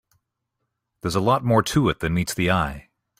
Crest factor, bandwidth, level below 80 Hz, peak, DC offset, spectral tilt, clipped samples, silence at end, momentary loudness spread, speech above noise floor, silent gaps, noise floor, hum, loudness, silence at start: 18 dB; 16 kHz; -44 dBFS; -4 dBFS; under 0.1%; -5.5 dB/octave; under 0.1%; 0.4 s; 10 LU; 58 dB; none; -79 dBFS; none; -22 LUFS; 1.05 s